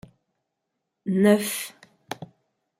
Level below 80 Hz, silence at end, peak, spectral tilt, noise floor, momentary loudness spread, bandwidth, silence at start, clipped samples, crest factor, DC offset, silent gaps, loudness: -70 dBFS; 0.55 s; -4 dBFS; -5 dB/octave; -81 dBFS; 19 LU; 16 kHz; 1.05 s; under 0.1%; 22 dB; under 0.1%; none; -22 LUFS